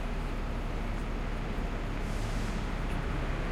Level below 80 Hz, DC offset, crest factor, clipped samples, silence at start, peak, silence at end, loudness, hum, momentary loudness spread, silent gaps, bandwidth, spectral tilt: -34 dBFS; under 0.1%; 12 dB; under 0.1%; 0 s; -20 dBFS; 0 s; -36 LUFS; none; 2 LU; none; 12 kHz; -6 dB/octave